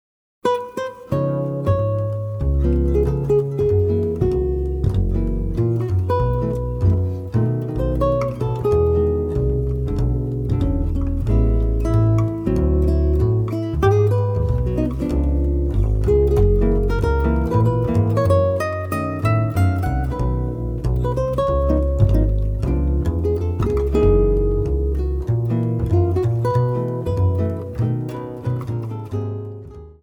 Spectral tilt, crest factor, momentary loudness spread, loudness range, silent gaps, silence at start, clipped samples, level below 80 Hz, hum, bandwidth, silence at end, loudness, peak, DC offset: -9.5 dB/octave; 16 dB; 7 LU; 2 LU; none; 0.45 s; under 0.1%; -24 dBFS; none; 15.5 kHz; 0.1 s; -20 LUFS; -4 dBFS; under 0.1%